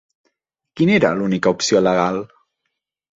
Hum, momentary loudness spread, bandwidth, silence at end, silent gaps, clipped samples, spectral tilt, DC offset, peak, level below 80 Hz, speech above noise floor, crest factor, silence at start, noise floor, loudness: none; 9 LU; 7.8 kHz; 0.9 s; none; under 0.1%; -5 dB/octave; under 0.1%; -2 dBFS; -56 dBFS; 60 dB; 18 dB; 0.75 s; -77 dBFS; -17 LUFS